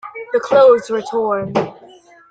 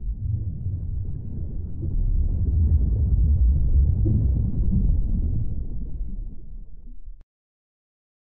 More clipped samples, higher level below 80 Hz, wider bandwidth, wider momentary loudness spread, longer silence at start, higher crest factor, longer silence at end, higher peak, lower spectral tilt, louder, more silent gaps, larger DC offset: neither; second, -58 dBFS vs -24 dBFS; first, 9 kHz vs 1.1 kHz; second, 11 LU vs 14 LU; about the same, 0.05 s vs 0 s; about the same, 14 dB vs 12 dB; second, 0.6 s vs 1.15 s; first, -2 dBFS vs -10 dBFS; second, -6 dB/octave vs -17 dB/octave; first, -15 LUFS vs -25 LUFS; neither; neither